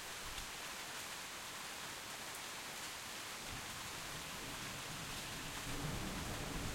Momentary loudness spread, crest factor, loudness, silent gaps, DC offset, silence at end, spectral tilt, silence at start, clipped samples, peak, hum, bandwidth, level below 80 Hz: 3 LU; 16 dB; -45 LUFS; none; under 0.1%; 0 s; -2.5 dB/octave; 0 s; under 0.1%; -30 dBFS; none; 16.5 kHz; -56 dBFS